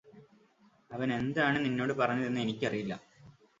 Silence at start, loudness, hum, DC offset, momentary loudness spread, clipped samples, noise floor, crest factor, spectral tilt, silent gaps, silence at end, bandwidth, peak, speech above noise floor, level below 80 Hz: 0.05 s; -32 LUFS; none; under 0.1%; 11 LU; under 0.1%; -66 dBFS; 20 dB; -6.5 dB/octave; none; 0.3 s; 7.8 kHz; -14 dBFS; 34 dB; -68 dBFS